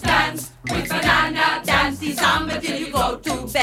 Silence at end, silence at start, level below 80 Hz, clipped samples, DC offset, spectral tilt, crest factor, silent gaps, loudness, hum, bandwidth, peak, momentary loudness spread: 0 s; 0 s; -38 dBFS; under 0.1%; under 0.1%; -3.5 dB/octave; 16 dB; none; -20 LUFS; none; 18 kHz; -4 dBFS; 8 LU